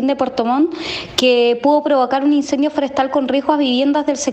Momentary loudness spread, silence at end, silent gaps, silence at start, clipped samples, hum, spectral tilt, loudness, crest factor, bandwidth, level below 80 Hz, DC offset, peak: 4 LU; 0 s; none; 0 s; under 0.1%; none; -3.5 dB/octave; -16 LUFS; 16 dB; 13 kHz; -54 dBFS; under 0.1%; 0 dBFS